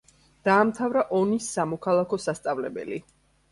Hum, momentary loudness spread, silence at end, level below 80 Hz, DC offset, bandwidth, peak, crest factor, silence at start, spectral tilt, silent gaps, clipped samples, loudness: none; 12 LU; 0.5 s; -64 dBFS; under 0.1%; 11.5 kHz; -8 dBFS; 18 dB; 0.45 s; -5.5 dB/octave; none; under 0.1%; -25 LUFS